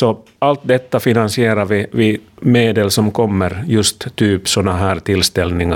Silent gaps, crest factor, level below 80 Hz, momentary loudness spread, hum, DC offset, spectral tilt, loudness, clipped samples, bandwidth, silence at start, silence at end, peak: none; 14 dB; -40 dBFS; 4 LU; none; under 0.1%; -5 dB/octave; -15 LUFS; under 0.1%; 18 kHz; 0 s; 0 s; 0 dBFS